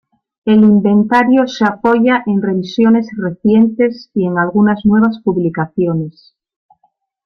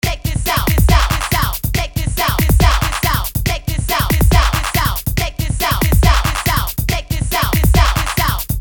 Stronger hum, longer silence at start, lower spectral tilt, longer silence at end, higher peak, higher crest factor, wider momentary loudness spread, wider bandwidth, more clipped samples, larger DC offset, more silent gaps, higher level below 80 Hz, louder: neither; first, 0.45 s vs 0.05 s; first, -8 dB/octave vs -4.5 dB/octave; first, 1.15 s vs 0 s; about the same, 0 dBFS vs 0 dBFS; about the same, 14 dB vs 14 dB; about the same, 7 LU vs 6 LU; second, 6.4 kHz vs 20 kHz; neither; neither; neither; second, -52 dBFS vs -18 dBFS; about the same, -13 LUFS vs -15 LUFS